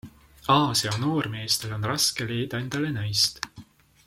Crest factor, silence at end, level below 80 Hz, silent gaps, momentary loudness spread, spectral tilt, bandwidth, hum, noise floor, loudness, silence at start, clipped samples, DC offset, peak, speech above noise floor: 20 dB; 0.45 s; -56 dBFS; none; 8 LU; -3.5 dB/octave; 16.5 kHz; none; -50 dBFS; -25 LUFS; 0.05 s; under 0.1%; under 0.1%; -6 dBFS; 24 dB